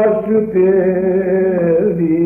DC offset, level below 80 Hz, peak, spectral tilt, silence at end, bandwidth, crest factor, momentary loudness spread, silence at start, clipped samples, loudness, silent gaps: under 0.1%; -48 dBFS; -4 dBFS; -12 dB/octave; 0 s; 2.9 kHz; 10 dB; 3 LU; 0 s; under 0.1%; -14 LUFS; none